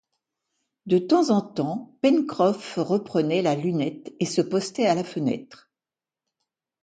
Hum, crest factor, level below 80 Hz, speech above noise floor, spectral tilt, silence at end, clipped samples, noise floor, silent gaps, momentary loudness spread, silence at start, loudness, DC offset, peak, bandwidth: none; 18 dB; -70 dBFS; over 67 dB; -6 dB/octave; 1.3 s; under 0.1%; under -90 dBFS; none; 8 LU; 0.85 s; -24 LUFS; under 0.1%; -8 dBFS; 9.4 kHz